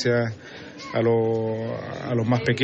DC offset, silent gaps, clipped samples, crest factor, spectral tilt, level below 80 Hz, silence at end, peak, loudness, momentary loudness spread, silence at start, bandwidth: under 0.1%; none; under 0.1%; 16 dB; -7 dB/octave; -60 dBFS; 0 s; -8 dBFS; -25 LUFS; 15 LU; 0 s; 8 kHz